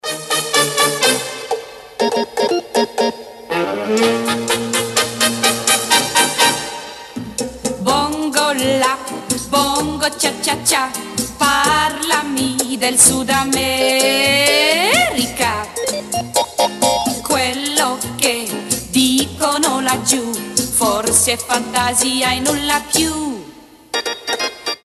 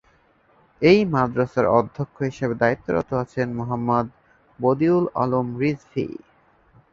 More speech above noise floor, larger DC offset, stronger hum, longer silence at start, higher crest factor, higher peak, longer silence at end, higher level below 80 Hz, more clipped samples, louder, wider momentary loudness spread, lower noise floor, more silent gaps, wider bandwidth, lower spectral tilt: second, 24 dB vs 38 dB; neither; neither; second, 0.05 s vs 0.8 s; about the same, 18 dB vs 20 dB; first, 0 dBFS vs -4 dBFS; second, 0.05 s vs 0.8 s; first, -46 dBFS vs -54 dBFS; neither; first, -15 LUFS vs -22 LUFS; about the same, 9 LU vs 11 LU; second, -40 dBFS vs -59 dBFS; neither; first, 14.5 kHz vs 7.4 kHz; second, -1.5 dB/octave vs -8 dB/octave